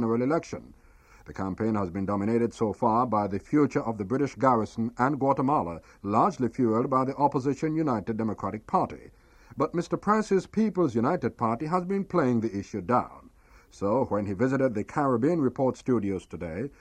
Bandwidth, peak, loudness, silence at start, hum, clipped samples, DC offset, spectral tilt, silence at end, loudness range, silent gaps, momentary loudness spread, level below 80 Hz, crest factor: 9.8 kHz; -8 dBFS; -27 LUFS; 0 s; none; under 0.1%; under 0.1%; -8 dB/octave; 0.1 s; 2 LU; none; 10 LU; -56 dBFS; 18 dB